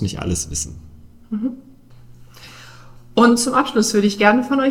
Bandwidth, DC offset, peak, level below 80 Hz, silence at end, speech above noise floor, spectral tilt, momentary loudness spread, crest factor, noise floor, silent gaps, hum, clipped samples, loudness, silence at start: 16 kHz; under 0.1%; 0 dBFS; -42 dBFS; 0 s; 26 dB; -4 dB/octave; 16 LU; 20 dB; -43 dBFS; none; none; under 0.1%; -18 LUFS; 0 s